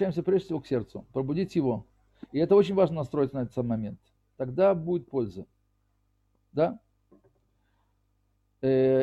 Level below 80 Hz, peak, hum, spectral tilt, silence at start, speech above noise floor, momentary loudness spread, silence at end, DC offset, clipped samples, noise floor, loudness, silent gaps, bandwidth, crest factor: -60 dBFS; -10 dBFS; 50 Hz at -55 dBFS; -9 dB/octave; 0 s; 45 dB; 13 LU; 0 s; under 0.1%; under 0.1%; -71 dBFS; -28 LUFS; none; 7.8 kHz; 18 dB